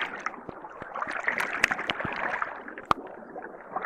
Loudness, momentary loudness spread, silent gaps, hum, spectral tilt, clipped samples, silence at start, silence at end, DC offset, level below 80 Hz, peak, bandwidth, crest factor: -30 LUFS; 16 LU; none; none; -3 dB/octave; under 0.1%; 0 s; 0 s; under 0.1%; -60 dBFS; -6 dBFS; 16 kHz; 26 dB